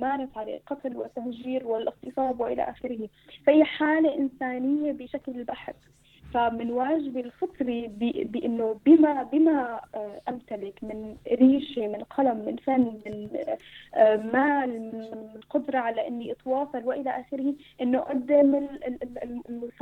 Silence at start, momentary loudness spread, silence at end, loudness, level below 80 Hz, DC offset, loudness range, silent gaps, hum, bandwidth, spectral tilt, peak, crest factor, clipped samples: 0 s; 15 LU; 0.1 s; -26 LUFS; -62 dBFS; under 0.1%; 5 LU; none; none; 4.2 kHz; -7.5 dB/octave; -6 dBFS; 20 dB; under 0.1%